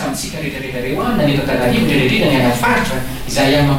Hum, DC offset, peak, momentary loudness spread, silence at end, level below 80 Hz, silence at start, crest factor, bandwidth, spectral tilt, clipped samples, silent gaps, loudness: none; under 0.1%; -4 dBFS; 9 LU; 0 s; -32 dBFS; 0 s; 12 dB; 16.5 kHz; -5 dB/octave; under 0.1%; none; -15 LUFS